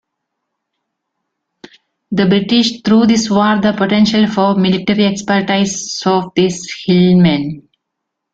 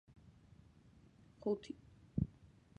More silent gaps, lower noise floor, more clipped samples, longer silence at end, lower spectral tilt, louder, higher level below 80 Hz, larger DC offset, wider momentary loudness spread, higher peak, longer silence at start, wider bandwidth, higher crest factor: neither; first, -76 dBFS vs -65 dBFS; neither; first, 0.75 s vs 0.5 s; second, -5.5 dB/octave vs -9 dB/octave; first, -13 LUFS vs -44 LUFS; first, -50 dBFS vs -60 dBFS; neither; second, 7 LU vs 25 LU; first, 0 dBFS vs -22 dBFS; first, 2.1 s vs 1.4 s; second, 8 kHz vs 9.4 kHz; second, 14 dB vs 24 dB